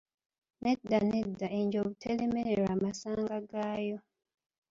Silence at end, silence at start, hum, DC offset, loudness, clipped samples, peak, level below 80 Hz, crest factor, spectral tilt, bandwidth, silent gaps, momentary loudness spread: 0.7 s; 0.6 s; none; under 0.1%; -33 LUFS; under 0.1%; -16 dBFS; -64 dBFS; 18 dB; -6.5 dB/octave; 7.8 kHz; none; 7 LU